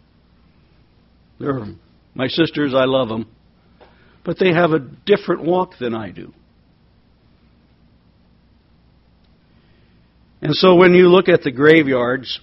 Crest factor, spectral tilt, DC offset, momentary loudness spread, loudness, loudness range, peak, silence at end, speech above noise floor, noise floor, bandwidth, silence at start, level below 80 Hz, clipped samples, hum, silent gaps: 18 dB; -4.5 dB/octave; under 0.1%; 18 LU; -16 LUFS; 12 LU; 0 dBFS; 0.05 s; 39 dB; -54 dBFS; 6 kHz; 1.4 s; -54 dBFS; under 0.1%; none; none